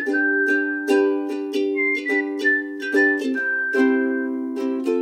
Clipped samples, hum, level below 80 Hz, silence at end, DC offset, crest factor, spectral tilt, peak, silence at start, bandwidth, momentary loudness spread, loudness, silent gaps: under 0.1%; none; -78 dBFS; 0 s; under 0.1%; 14 dB; -3.5 dB/octave; -6 dBFS; 0 s; 13.5 kHz; 6 LU; -21 LUFS; none